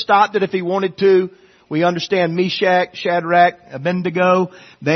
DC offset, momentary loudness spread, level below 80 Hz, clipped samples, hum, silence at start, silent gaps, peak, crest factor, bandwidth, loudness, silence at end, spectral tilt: under 0.1%; 9 LU; -62 dBFS; under 0.1%; none; 0 s; none; 0 dBFS; 16 dB; 6.4 kHz; -17 LUFS; 0 s; -6 dB/octave